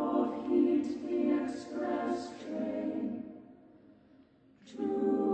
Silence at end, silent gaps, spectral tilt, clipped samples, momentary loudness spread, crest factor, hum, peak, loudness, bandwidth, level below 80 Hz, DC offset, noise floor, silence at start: 0 s; none; -7 dB/octave; under 0.1%; 11 LU; 16 dB; none; -18 dBFS; -33 LUFS; 8.6 kHz; -72 dBFS; under 0.1%; -62 dBFS; 0 s